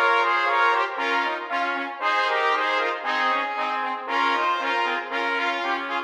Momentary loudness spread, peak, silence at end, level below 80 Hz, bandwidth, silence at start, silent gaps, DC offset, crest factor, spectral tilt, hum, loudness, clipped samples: 6 LU; -8 dBFS; 0 s; -80 dBFS; 13 kHz; 0 s; none; under 0.1%; 16 dB; -0.5 dB/octave; none; -23 LUFS; under 0.1%